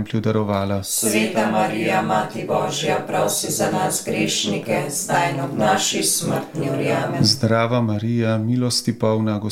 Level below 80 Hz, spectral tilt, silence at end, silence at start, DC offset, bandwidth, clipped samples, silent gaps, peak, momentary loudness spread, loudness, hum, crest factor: -58 dBFS; -4 dB/octave; 0 s; 0 s; under 0.1%; 17 kHz; under 0.1%; none; -4 dBFS; 5 LU; -20 LUFS; none; 16 dB